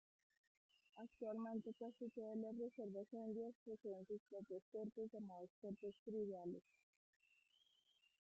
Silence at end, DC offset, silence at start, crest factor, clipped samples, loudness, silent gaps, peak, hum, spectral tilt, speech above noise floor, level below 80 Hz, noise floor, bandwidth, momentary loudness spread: 1.6 s; under 0.1%; 0.95 s; 16 dB; under 0.1%; -52 LUFS; 3.55-3.66 s, 4.20-4.26 s, 4.62-4.72 s, 5.50-5.62 s, 5.99-6.06 s; -38 dBFS; none; -8 dB/octave; 29 dB; under -90 dBFS; -81 dBFS; 7.6 kHz; 6 LU